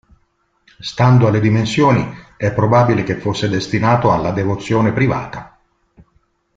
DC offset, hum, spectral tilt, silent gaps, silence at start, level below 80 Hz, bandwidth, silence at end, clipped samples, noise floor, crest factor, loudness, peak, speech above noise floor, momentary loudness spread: under 0.1%; none; -7 dB/octave; none; 0.8 s; -44 dBFS; 7.8 kHz; 1.1 s; under 0.1%; -62 dBFS; 14 dB; -15 LUFS; -2 dBFS; 48 dB; 12 LU